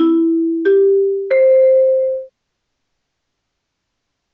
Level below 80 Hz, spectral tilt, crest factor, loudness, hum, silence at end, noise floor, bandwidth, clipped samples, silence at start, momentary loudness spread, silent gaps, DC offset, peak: -70 dBFS; -7.5 dB/octave; 10 dB; -13 LUFS; none; 2.05 s; -74 dBFS; 4.3 kHz; under 0.1%; 0 s; 7 LU; none; under 0.1%; -6 dBFS